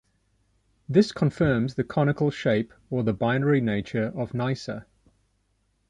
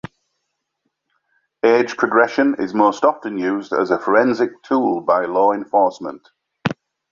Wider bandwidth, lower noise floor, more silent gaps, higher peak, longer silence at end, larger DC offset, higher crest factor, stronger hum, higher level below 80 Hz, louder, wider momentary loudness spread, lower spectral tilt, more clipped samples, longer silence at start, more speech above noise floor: first, 9.8 kHz vs 7.4 kHz; second, -70 dBFS vs -75 dBFS; neither; second, -6 dBFS vs -2 dBFS; first, 1.05 s vs 0.4 s; neither; about the same, 20 dB vs 18 dB; neither; first, -54 dBFS vs -62 dBFS; second, -25 LUFS vs -18 LUFS; second, 7 LU vs 10 LU; first, -7.5 dB/octave vs -6 dB/octave; neither; second, 0.9 s vs 1.65 s; second, 46 dB vs 58 dB